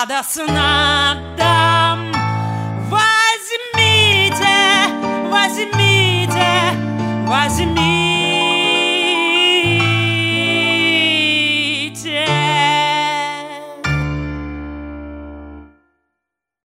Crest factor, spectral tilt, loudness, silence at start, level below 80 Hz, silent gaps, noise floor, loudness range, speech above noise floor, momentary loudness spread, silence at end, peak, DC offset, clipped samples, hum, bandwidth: 16 dB; -3.5 dB/octave; -14 LUFS; 0 s; -38 dBFS; none; -79 dBFS; 6 LU; 64 dB; 12 LU; 1 s; 0 dBFS; under 0.1%; under 0.1%; none; 16 kHz